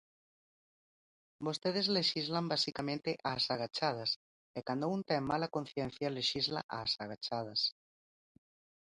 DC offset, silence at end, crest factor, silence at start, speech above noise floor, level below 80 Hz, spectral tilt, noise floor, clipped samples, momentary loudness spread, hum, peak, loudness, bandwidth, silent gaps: under 0.1%; 1.1 s; 20 dB; 1.4 s; over 54 dB; -72 dBFS; -4.5 dB/octave; under -90 dBFS; under 0.1%; 8 LU; none; -18 dBFS; -35 LUFS; 11.5 kHz; 4.16-4.54 s, 6.63-6.69 s